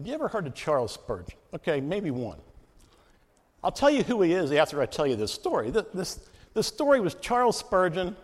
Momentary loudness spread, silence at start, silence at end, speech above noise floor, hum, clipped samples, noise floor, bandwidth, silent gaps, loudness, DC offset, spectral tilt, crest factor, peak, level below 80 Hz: 11 LU; 0 s; 0 s; 36 dB; none; under 0.1%; -63 dBFS; 15.5 kHz; none; -27 LUFS; under 0.1%; -5 dB/octave; 20 dB; -8 dBFS; -54 dBFS